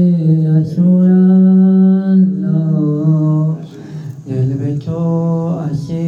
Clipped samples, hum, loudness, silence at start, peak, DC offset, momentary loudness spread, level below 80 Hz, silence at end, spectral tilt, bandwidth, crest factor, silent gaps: under 0.1%; none; -13 LUFS; 0 s; -4 dBFS; under 0.1%; 12 LU; -54 dBFS; 0 s; -11 dB/octave; 1.8 kHz; 8 dB; none